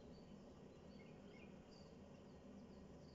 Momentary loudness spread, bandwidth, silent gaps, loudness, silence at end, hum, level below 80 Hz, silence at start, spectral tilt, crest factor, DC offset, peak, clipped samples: 1 LU; 7.4 kHz; none; -61 LUFS; 0 s; none; -74 dBFS; 0 s; -6 dB/octave; 14 dB; under 0.1%; -48 dBFS; under 0.1%